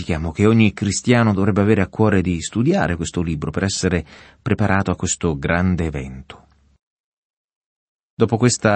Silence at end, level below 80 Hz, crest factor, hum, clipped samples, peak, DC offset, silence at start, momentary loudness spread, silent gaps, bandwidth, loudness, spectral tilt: 0 s; -40 dBFS; 18 dB; none; under 0.1%; -2 dBFS; under 0.1%; 0 s; 8 LU; 6.83-7.48 s, 7.56-8.17 s; 8.8 kHz; -19 LUFS; -5.5 dB/octave